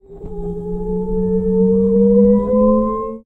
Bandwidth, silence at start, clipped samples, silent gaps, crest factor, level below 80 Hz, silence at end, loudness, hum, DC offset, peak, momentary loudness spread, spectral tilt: 2.2 kHz; 0.1 s; under 0.1%; none; 12 dB; -32 dBFS; 0.05 s; -15 LUFS; none; under 0.1%; -2 dBFS; 14 LU; -13 dB/octave